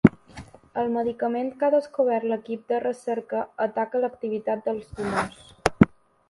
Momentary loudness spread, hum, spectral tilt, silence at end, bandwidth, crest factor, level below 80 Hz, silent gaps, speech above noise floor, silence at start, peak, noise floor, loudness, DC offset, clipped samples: 9 LU; none; -7.5 dB/octave; 0.4 s; 11.5 kHz; 24 dB; -50 dBFS; none; 19 dB; 0.05 s; 0 dBFS; -45 dBFS; -26 LUFS; under 0.1%; under 0.1%